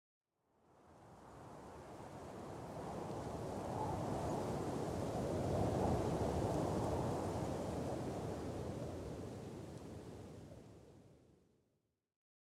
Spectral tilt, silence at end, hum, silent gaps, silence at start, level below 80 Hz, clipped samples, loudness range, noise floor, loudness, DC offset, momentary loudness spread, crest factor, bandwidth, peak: -7 dB/octave; 1.35 s; none; none; 0.75 s; -58 dBFS; under 0.1%; 12 LU; -84 dBFS; -42 LUFS; under 0.1%; 18 LU; 18 dB; 16 kHz; -26 dBFS